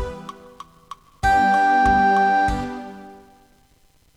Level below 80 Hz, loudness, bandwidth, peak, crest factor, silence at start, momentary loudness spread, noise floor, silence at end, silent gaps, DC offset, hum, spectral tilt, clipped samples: -38 dBFS; -18 LUFS; 12 kHz; -8 dBFS; 14 dB; 0 s; 22 LU; -57 dBFS; 1 s; none; under 0.1%; none; -5.5 dB/octave; under 0.1%